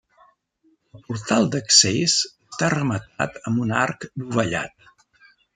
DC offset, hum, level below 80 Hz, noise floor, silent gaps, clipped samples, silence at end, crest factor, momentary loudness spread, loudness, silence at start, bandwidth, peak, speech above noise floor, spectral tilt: under 0.1%; none; -58 dBFS; -64 dBFS; none; under 0.1%; 0.85 s; 22 dB; 15 LU; -20 LUFS; 0.95 s; 11 kHz; 0 dBFS; 42 dB; -3 dB/octave